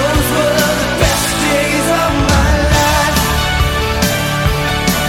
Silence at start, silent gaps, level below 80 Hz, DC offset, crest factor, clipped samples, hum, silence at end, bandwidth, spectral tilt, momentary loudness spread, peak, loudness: 0 s; none; -20 dBFS; under 0.1%; 12 dB; under 0.1%; none; 0 s; 17 kHz; -4 dB/octave; 3 LU; 0 dBFS; -13 LUFS